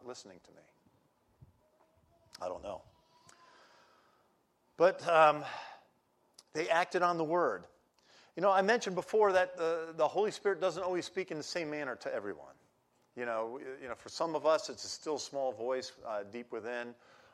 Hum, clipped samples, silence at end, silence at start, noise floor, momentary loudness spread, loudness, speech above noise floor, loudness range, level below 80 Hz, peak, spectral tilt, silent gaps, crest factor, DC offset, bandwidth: none; under 0.1%; 0.4 s; 0.05 s; -74 dBFS; 17 LU; -33 LUFS; 40 dB; 18 LU; -78 dBFS; -12 dBFS; -4 dB/octave; none; 22 dB; under 0.1%; 13 kHz